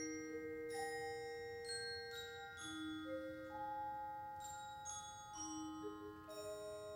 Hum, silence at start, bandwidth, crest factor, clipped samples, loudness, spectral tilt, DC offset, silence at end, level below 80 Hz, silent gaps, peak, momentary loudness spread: none; 0 s; 17 kHz; 14 dB; under 0.1%; -48 LUFS; -3 dB/octave; under 0.1%; 0 s; -74 dBFS; none; -36 dBFS; 5 LU